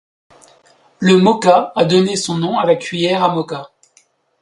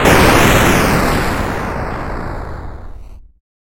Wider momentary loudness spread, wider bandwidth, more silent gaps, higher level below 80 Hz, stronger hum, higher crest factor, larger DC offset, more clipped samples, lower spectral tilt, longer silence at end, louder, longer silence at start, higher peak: second, 8 LU vs 20 LU; second, 11.5 kHz vs 17.5 kHz; neither; second, -60 dBFS vs -24 dBFS; neither; about the same, 16 dB vs 14 dB; neither; neither; about the same, -5.5 dB/octave vs -4.5 dB/octave; first, 0.75 s vs 0.55 s; about the same, -14 LUFS vs -13 LUFS; first, 1 s vs 0 s; about the same, 0 dBFS vs 0 dBFS